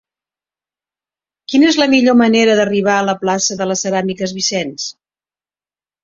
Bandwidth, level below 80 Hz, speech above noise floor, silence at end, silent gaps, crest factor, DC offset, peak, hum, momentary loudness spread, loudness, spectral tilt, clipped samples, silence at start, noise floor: 7.8 kHz; -58 dBFS; over 76 dB; 1.1 s; none; 14 dB; under 0.1%; 0 dBFS; none; 10 LU; -14 LUFS; -3.5 dB/octave; under 0.1%; 1.5 s; under -90 dBFS